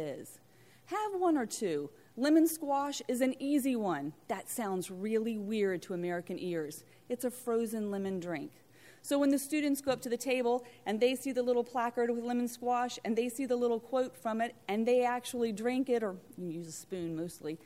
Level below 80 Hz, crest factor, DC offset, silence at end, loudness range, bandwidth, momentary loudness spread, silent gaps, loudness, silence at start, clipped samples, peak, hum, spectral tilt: -78 dBFS; 16 dB; under 0.1%; 0.1 s; 4 LU; 16 kHz; 11 LU; none; -34 LUFS; 0 s; under 0.1%; -16 dBFS; none; -4.5 dB/octave